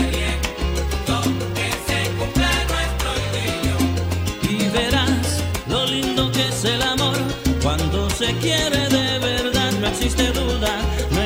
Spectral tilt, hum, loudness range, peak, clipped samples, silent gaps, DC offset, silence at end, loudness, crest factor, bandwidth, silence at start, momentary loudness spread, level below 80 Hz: -4 dB/octave; none; 2 LU; -4 dBFS; under 0.1%; none; under 0.1%; 0 s; -20 LUFS; 16 dB; 16.5 kHz; 0 s; 4 LU; -28 dBFS